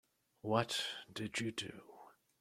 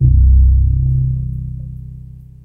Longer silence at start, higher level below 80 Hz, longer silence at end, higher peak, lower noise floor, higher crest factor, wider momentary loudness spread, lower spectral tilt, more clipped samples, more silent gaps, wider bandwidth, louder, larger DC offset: first, 0.45 s vs 0 s; second, -78 dBFS vs -14 dBFS; about the same, 0.3 s vs 0.4 s; second, -18 dBFS vs 0 dBFS; first, -62 dBFS vs -34 dBFS; first, 24 dB vs 12 dB; second, 16 LU vs 21 LU; second, -4 dB/octave vs -13.5 dB/octave; neither; neither; first, 15.5 kHz vs 0.5 kHz; second, -40 LUFS vs -14 LUFS; second, under 0.1% vs 0.2%